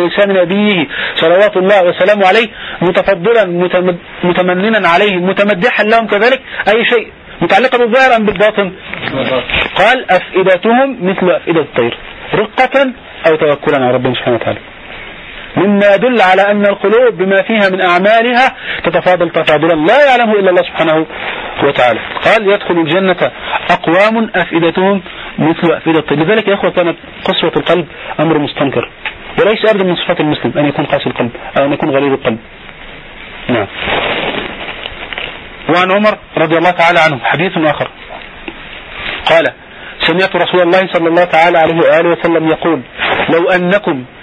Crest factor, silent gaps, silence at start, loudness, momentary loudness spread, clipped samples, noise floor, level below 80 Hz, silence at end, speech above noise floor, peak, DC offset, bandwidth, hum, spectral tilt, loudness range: 12 dB; none; 0 s; -11 LUFS; 12 LU; under 0.1%; -30 dBFS; -42 dBFS; 0 s; 20 dB; 0 dBFS; under 0.1%; 10 kHz; none; -6.5 dB/octave; 4 LU